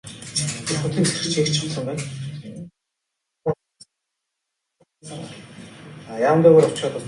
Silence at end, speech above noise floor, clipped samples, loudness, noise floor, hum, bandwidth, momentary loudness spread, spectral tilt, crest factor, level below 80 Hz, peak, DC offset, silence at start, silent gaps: 0 s; 61 dB; under 0.1%; -20 LUFS; -80 dBFS; none; 11.5 kHz; 25 LU; -5 dB/octave; 22 dB; -58 dBFS; -2 dBFS; under 0.1%; 0.05 s; none